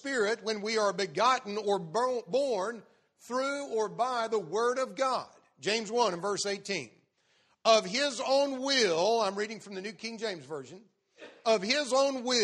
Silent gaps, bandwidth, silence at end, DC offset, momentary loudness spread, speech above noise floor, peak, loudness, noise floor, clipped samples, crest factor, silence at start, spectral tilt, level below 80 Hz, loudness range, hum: none; 12 kHz; 0 s; under 0.1%; 12 LU; 40 dB; -8 dBFS; -30 LUFS; -70 dBFS; under 0.1%; 22 dB; 0.05 s; -2.5 dB/octave; -82 dBFS; 3 LU; none